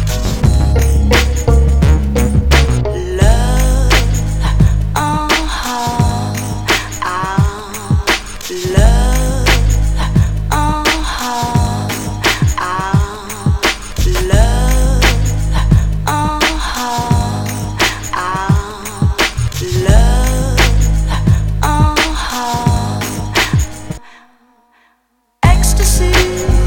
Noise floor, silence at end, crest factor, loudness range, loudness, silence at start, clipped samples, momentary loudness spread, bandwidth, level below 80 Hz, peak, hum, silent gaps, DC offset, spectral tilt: -60 dBFS; 0 s; 12 dB; 3 LU; -14 LUFS; 0 s; under 0.1%; 7 LU; 18 kHz; -16 dBFS; 0 dBFS; none; none; under 0.1%; -4.5 dB/octave